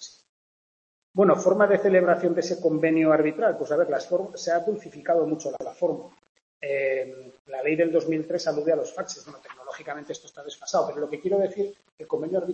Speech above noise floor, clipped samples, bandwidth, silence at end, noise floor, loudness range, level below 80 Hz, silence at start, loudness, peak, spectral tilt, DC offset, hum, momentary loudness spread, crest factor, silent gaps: over 65 dB; under 0.1%; 8.4 kHz; 0 s; under -90 dBFS; 7 LU; -74 dBFS; 0 s; -25 LUFS; -6 dBFS; -5.5 dB/octave; under 0.1%; none; 17 LU; 18 dB; 0.29-1.14 s, 6.29-6.35 s, 6.42-6.61 s, 7.39-7.45 s, 11.92-11.98 s